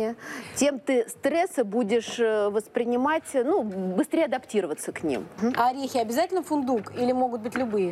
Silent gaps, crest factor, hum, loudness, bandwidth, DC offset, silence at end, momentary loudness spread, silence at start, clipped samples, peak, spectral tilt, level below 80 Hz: none; 16 dB; none; -26 LUFS; 15.5 kHz; under 0.1%; 0 s; 5 LU; 0 s; under 0.1%; -10 dBFS; -4.5 dB/octave; -68 dBFS